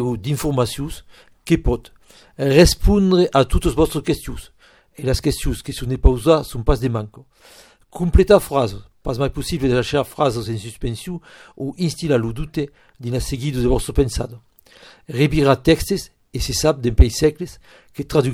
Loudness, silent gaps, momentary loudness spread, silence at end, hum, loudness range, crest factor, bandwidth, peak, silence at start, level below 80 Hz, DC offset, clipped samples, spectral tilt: -19 LUFS; none; 16 LU; 0 s; none; 5 LU; 18 dB; 17 kHz; 0 dBFS; 0 s; -26 dBFS; under 0.1%; under 0.1%; -6 dB/octave